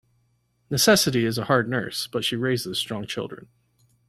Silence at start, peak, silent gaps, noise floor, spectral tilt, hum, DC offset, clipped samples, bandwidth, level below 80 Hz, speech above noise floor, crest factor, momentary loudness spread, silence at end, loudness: 0.7 s; -6 dBFS; none; -68 dBFS; -3.5 dB/octave; none; under 0.1%; under 0.1%; 16 kHz; -58 dBFS; 44 dB; 20 dB; 14 LU; 0.7 s; -23 LUFS